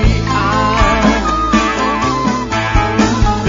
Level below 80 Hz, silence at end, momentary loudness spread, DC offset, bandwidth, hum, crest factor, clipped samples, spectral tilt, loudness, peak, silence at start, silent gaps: -20 dBFS; 0 s; 3 LU; under 0.1%; 7.6 kHz; none; 12 dB; under 0.1%; -5.5 dB/octave; -13 LUFS; 0 dBFS; 0 s; none